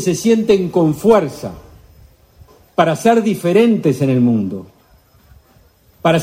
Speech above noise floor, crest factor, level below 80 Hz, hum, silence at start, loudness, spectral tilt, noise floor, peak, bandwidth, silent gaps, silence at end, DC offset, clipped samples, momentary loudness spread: 37 dB; 16 dB; -50 dBFS; none; 0 s; -15 LUFS; -6.5 dB/octave; -51 dBFS; 0 dBFS; 16 kHz; none; 0 s; under 0.1%; under 0.1%; 12 LU